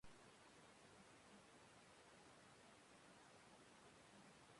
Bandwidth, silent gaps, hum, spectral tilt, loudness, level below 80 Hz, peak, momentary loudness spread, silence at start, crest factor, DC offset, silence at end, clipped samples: 11.5 kHz; none; none; -3 dB/octave; -67 LUFS; -86 dBFS; -50 dBFS; 1 LU; 0 s; 16 dB; under 0.1%; 0 s; under 0.1%